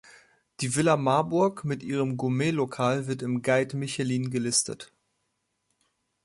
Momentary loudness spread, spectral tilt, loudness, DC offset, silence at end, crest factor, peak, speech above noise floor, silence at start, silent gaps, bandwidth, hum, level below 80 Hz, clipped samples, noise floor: 7 LU; -5 dB/octave; -27 LUFS; under 0.1%; 1.4 s; 18 dB; -10 dBFS; 51 dB; 0.6 s; none; 11.5 kHz; none; -66 dBFS; under 0.1%; -77 dBFS